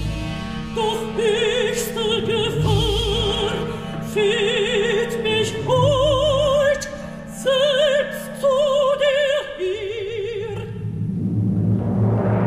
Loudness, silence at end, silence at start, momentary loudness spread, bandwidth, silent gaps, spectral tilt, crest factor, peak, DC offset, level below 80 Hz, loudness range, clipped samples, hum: -20 LUFS; 0 s; 0 s; 10 LU; 15.5 kHz; none; -5 dB/octave; 14 dB; -6 dBFS; under 0.1%; -36 dBFS; 3 LU; under 0.1%; none